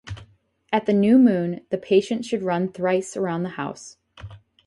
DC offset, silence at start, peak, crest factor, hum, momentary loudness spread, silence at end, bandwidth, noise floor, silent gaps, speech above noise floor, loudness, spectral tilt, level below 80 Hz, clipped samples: under 0.1%; 0.05 s; -6 dBFS; 16 dB; none; 23 LU; 0.3 s; 11.5 kHz; -55 dBFS; none; 34 dB; -22 LUFS; -6.5 dB/octave; -56 dBFS; under 0.1%